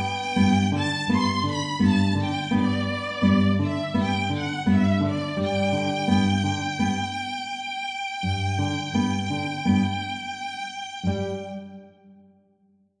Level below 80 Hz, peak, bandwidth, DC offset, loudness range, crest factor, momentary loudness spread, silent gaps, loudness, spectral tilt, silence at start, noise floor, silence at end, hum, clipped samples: -54 dBFS; -6 dBFS; 10 kHz; under 0.1%; 5 LU; 18 dB; 9 LU; none; -24 LUFS; -6 dB/octave; 0 s; -63 dBFS; 0.9 s; none; under 0.1%